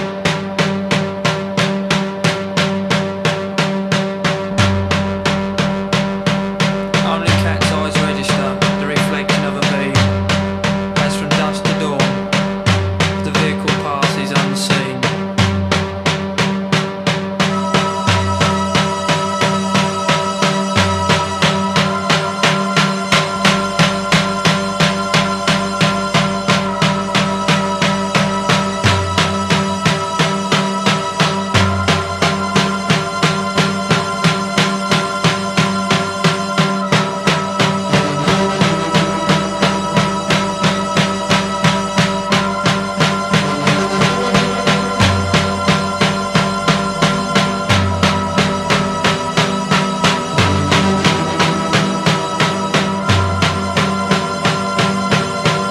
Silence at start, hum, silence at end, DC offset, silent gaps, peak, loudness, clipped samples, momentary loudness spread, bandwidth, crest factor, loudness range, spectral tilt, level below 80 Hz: 0 s; none; 0 s; under 0.1%; none; 0 dBFS; -15 LUFS; under 0.1%; 3 LU; 13.5 kHz; 16 dB; 2 LU; -4.5 dB/octave; -42 dBFS